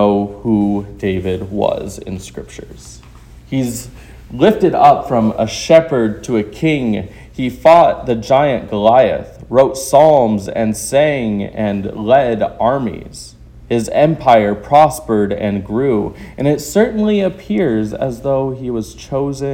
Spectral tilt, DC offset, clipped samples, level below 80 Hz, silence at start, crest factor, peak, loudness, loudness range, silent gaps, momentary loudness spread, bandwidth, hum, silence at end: -6 dB/octave; under 0.1%; 0.4%; -40 dBFS; 0 s; 14 dB; 0 dBFS; -14 LUFS; 7 LU; none; 14 LU; 17 kHz; none; 0 s